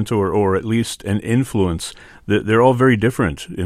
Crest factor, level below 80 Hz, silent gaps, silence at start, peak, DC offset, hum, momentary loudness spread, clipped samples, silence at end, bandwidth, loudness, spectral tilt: 16 dB; -42 dBFS; none; 0 s; -2 dBFS; under 0.1%; none; 9 LU; under 0.1%; 0 s; 15.5 kHz; -18 LUFS; -6.5 dB/octave